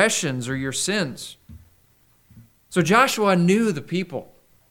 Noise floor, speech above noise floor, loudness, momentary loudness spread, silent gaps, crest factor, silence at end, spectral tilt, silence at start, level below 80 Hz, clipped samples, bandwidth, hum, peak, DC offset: -59 dBFS; 38 dB; -21 LUFS; 15 LU; none; 20 dB; 0.45 s; -4.5 dB/octave; 0 s; -58 dBFS; under 0.1%; 19 kHz; none; -2 dBFS; under 0.1%